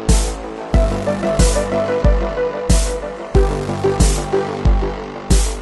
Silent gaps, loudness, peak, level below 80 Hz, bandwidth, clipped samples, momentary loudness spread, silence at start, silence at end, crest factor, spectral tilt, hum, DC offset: none; -18 LUFS; -2 dBFS; -18 dBFS; 12 kHz; under 0.1%; 6 LU; 0 s; 0 s; 14 dB; -5 dB/octave; none; under 0.1%